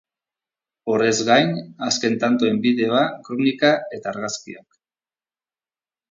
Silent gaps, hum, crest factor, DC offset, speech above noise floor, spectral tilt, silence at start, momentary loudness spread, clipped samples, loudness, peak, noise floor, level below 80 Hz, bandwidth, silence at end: none; none; 20 dB; under 0.1%; over 70 dB; -4 dB/octave; 0.85 s; 12 LU; under 0.1%; -20 LUFS; -2 dBFS; under -90 dBFS; -66 dBFS; 7.6 kHz; 1.5 s